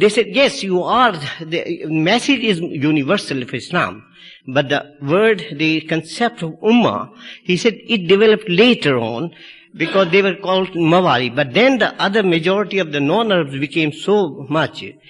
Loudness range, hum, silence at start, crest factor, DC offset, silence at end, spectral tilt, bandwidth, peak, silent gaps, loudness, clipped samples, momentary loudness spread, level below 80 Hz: 3 LU; none; 0 s; 14 dB; under 0.1%; 0.2 s; -5.5 dB/octave; 11.5 kHz; -2 dBFS; none; -16 LUFS; under 0.1%; 10 LU; -58 dBFS